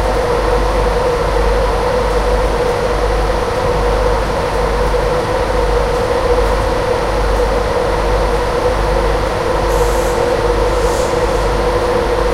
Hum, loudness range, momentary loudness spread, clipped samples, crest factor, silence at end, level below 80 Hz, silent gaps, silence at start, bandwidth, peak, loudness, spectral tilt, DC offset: none; 1 LU; 1 LU; under 0.1%; 14 dB; 0 s; -20 dBFS; none; 0 s; 15.5 kHz; 0 dBFS; -15 LUFS; -5.5 dB/octave; under 0.1%